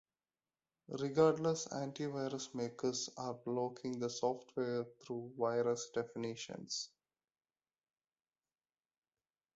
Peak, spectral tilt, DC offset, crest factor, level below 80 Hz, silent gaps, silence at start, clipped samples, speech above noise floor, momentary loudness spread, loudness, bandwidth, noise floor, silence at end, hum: -18 dBFS; -5 dB/octave; under 0.1%; 22 dB; -80 dBFS; none; 0.9 s; under 0.1%; over 51 dB; 11 LU; -39 LUFS; 8 kHz; under -90 dBFS; 2.7 s; none